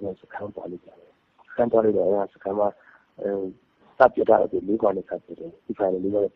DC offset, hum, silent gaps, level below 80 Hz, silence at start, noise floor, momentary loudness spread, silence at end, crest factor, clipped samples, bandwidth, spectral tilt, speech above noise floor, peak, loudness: under 0.1%; none; none; -62 dBFS; 0 s; -50 dBFS; 16 LU; 0.1 s; 22 dB; under 0.1%; 5.6 kHz; -9.5 dB/octave; 27 dB; -2 dBFS; -23 LUFS